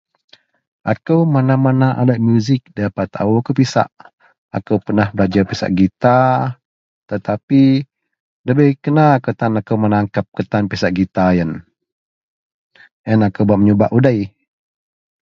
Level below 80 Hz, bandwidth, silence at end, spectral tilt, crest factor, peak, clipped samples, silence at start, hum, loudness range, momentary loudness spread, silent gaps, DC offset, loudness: -44 dBFS; 7.4 kHz; 0.95 s; -8 dB/octave; 16 dB; 0 dBFS; under 0.1%; 0.85 s; none; 3 LU; 11 LU; 4.13-4.18 s, 4.38-4.49 s, 6.65-7.08 s, 7.43-7.48 s, 8.20-8.44 s, 10.28-10.32 s, 11.92-12.70 s, 12.91-13.04 s; under 0.1%; -15 LUFS